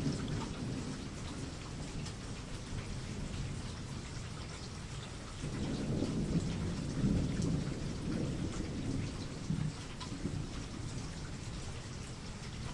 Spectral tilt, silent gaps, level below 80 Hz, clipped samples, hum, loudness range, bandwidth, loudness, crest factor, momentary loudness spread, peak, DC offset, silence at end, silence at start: -5.5 dB/octave; none; -48 dBFS; under 0.1%; none; 6 LU; 11.5 kHz; -40 LUFS; 18 dB; 9 LU; -20 dBFS; under 0.1%; 0 s; 0 s